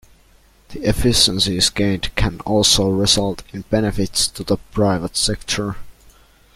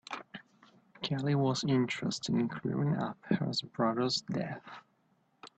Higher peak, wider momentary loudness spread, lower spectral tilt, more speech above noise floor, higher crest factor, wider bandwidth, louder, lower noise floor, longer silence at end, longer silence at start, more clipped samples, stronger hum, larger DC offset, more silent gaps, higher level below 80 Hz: first, 0 dBFS vs -16 dBFS; second, 10 LU vs 15 LU; second, -3.5 dB/octave vs -5.5 dB/octave; second, 34 dB vs 40 dB; about the same, 20 dB vs 18 dB; first, 16 kHz vs 8.8 kHz; first, -17 LUFS vs -33 LUFS; second, -52 dBFS vs -72 dBFS; first, 0.65 s vs 0.1 s; first, 0.7 s vs 0.1 s; neither; neither; neither; neither; first, -34 dBFS vs -70 dBFS